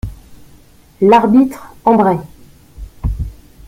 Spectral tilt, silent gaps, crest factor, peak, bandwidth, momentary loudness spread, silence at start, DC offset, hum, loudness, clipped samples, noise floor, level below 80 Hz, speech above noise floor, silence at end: -8 dB/octave; none; 16 dB; 0 dBFS; 16 kHz; 17 LU; 0.05 s; under 0.1%; none; -13 LUFS; under 0.1%; -44 dBFS; -30 dBFS; 33 dB; 0.35 s